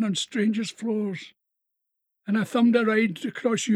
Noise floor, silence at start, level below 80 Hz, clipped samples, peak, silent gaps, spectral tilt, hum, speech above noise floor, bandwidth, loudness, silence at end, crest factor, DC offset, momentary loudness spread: -81 dBFS; 0 s; -84 dBFS; under 0.1%; -8 dBFS; none; -5 dB/octave; none; 57 dB; 12.5 kHz; -25 LUFS; 0 s; 18 dB; under 0.1%; 10 LU